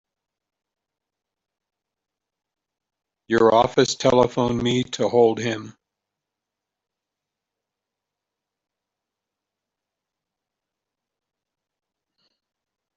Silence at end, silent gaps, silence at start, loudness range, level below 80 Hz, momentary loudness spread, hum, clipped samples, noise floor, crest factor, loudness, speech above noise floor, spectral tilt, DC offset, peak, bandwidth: 7.25 s; none; 3.3 s; 7 LU; -58 dBFS; 9 LU; none; under 0.1%; -85 dBFS; 24 dB; -20 LUFS; 66 dB; -5 dB/octave; under 0.1%; -2 dBFS; 8 kHz